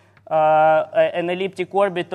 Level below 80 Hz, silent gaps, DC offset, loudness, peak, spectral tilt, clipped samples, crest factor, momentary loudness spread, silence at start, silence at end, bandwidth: -72 dBFS; none; under 0.1%; -19 LUFS; -6 dBFS; -6.5 dB/octave; under 0.1%; 14 dB; 9 LU; 0.3 s; 0 s; 10 kHz